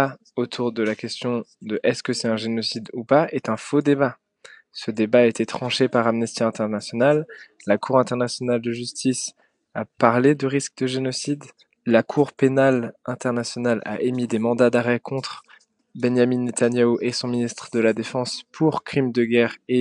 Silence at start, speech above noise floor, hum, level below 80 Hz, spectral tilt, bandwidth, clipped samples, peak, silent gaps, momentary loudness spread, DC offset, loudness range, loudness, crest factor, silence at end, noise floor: 0 s; 29 dB; none; -70 dBFS; -5 dB/octave; 11 kHz; under 0.1%; 0 dBFS; none; 10 LU; under 0.1%; 2 LU; -22 LUFS; 22 dB; 0 s; -50 dBFS